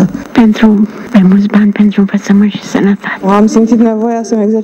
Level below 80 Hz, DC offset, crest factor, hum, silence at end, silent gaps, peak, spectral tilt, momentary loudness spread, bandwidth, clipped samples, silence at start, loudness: -42 dBFS; under 0.1%; 8 dB; none; 0 s; none; 0 dBFS; -7 dB/octave; 5 LU; 8.2 kHz; 0.8%; 0 s; -9 LUFS